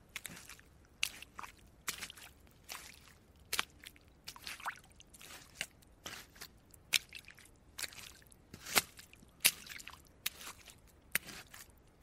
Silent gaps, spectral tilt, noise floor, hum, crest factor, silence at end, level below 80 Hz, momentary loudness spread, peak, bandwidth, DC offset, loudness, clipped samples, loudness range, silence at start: none; 0 dB/octave; -62 dBFS; none; 40 dB; 0.15 s; -66 dBFS; 24 LU; -4 dBFS; 16 kHz; under 0.1%; -39 LUFS; under 0.1%; 8 LU; 0.1 s